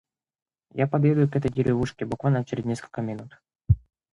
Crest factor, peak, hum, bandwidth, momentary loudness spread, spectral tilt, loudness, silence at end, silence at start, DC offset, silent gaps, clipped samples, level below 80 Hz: 18 dB; -8 dBFS; none; 11 kHz; 11 LU; -8.5 dB/octave; -25 LUFS; 0.35 s; 0.75 s; under 0.1%; 3.55-3.59 s; under 0.1%; -42 dBFS